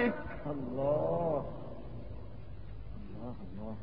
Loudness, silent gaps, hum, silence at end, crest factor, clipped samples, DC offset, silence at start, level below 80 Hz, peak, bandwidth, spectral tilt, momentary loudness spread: -37 LUFS; none; none; 0 s; 18 dB; under 0.1%; 0.6%; 0 s; -50 dBFS; -20 dBFS; 5 kHz; -7 dB/octave; 17 LU